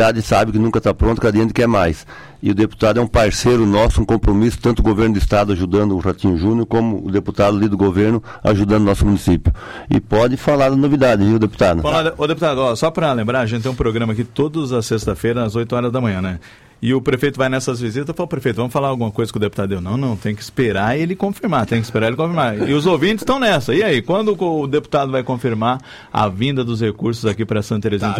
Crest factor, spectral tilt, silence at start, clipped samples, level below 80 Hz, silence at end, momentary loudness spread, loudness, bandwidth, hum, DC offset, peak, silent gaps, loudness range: 12 dB; -6.5 dB/octave; 0 s; under 0.1%; -30 dBFS; 0 s; 6 LU; -17 LUFS; 15.5 kHz; none; under 0.1%; -4 dBFS; none; 4 LU